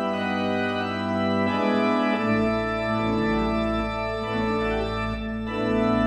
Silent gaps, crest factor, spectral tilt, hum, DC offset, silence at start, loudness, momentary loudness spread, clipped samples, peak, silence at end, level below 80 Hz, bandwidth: none; 14 dB; -7 dB/octave; none; under 0.1%; 0 s; -25 LUFS; 5 LU; under 0.1%; -10 dBFS; 0 s; -40 dBFS; 10 kHz